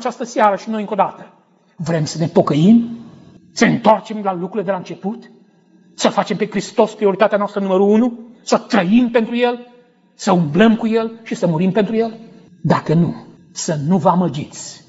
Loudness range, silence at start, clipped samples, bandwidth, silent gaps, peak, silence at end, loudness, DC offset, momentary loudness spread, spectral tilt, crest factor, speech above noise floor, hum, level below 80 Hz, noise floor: 3 LU; 0 s; under 0.1%; 8 kHz; none; 0 dBFS; 0.1 s; -17 LUFS; under 0.1%; 13 LU; -6 dB/octave; 16 dB; 35 dB; none; -58 dBFS; -51 dBFS